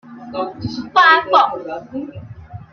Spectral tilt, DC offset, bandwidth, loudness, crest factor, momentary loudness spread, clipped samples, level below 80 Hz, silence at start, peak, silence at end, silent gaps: -5 dB/octave; under 0.1%; 7 kHz; -14 LUFS; 16 dB; 24 LU; under 0.1%; -52 dBFS; 0.05 s; -2 dBFS; 0.1 s; none